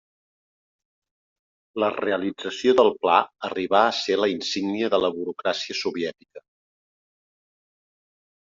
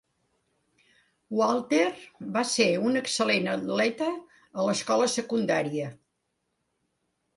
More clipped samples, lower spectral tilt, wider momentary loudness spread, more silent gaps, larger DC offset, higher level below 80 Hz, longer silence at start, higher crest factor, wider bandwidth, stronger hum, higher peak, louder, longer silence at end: neither; second, -2 dB/octave vs -4 dB/octave; about the same, 11 LU vs 9 LU; neither; neither; about the same, -70 dBFS vs -74 dBFS; first, 1.75 s vs 1.3 s; about the same, 22 dB vs 18 dB; second, 7.6 kHz vs 11.5 kHz; neither; first, -4 dBFS vs -10 dBFS; first, -23 LUFS vs -26 LUFS; first, 2.1 s vs 1.4 s